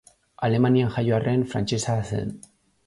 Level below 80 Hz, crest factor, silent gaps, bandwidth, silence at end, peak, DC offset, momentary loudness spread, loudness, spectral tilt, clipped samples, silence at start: -52 dBFS; 14 dB; none; 11.5 kHz; 0.5 s; -10 dBFS; under 0.1%; 9 LU; -24 LUFS; -6.5 dB/octave; under 0.1%; 0.4 s